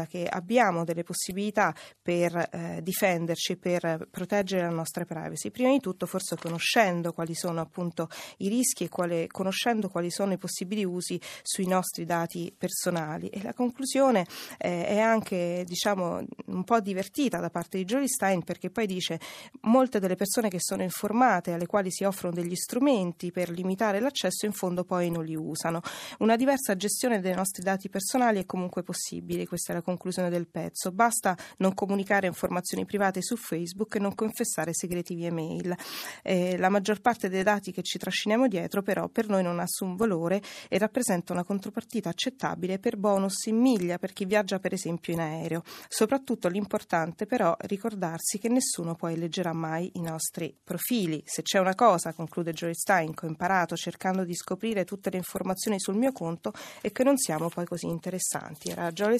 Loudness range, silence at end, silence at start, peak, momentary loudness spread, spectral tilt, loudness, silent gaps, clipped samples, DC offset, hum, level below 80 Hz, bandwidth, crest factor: 3 LU; 0 s; 0 s; -8 dBFS; 9 LU; -4.5 dB/octave; -29 LUFS; none; under 0.1%; under 0.1%; none; -68 dBFS; 15 kHz; 22 dB